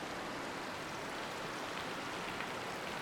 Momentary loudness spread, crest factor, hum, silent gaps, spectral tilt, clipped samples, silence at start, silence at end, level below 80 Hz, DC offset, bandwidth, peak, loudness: 2 LU; 18 dB; none; none; -3 dB/octave; under 0.1%; 0 s; 0 s; -66 dBFS; under 0.1%; 19.5 kHz; -24 dBFS; -41 LUFS